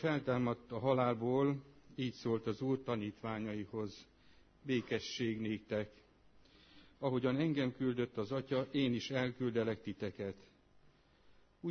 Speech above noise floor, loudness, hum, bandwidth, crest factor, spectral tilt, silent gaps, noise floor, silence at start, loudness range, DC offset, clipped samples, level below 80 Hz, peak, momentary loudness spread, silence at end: 30 dB; -38 LUFS; none; 6.4 kHz; 20 dB; -5.5 dB/octave; none; -67 dBFS; 0 s; 5 LU; under 0.1%; under 0.1%; -70 dBFS; -20 dBFS; 11 LU; 0 s